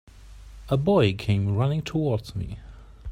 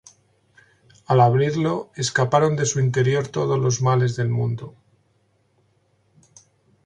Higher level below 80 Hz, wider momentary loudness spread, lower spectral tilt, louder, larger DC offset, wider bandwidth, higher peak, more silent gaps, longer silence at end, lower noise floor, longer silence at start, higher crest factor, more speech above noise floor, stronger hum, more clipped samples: first, -44 dBFS vs -58 dBFS; first, 16 LU vs 8 LU; first, -7.5 dB/octave vs -5.5 dB/octave; second, -25 LUFS vs -21 LUFS; neither; first, 12 kHz vs 9.6 kHz; second, -8 dBFS vs -4 dBFS; neither; second, 0 s vs 2.15 s; second, -45 dBFS vs -64 dBFS; second, 0.15 s vs 1.1 s; about the same, 18 dB vs 20 dB; second, 21 dB vs 45 dB; neither; neither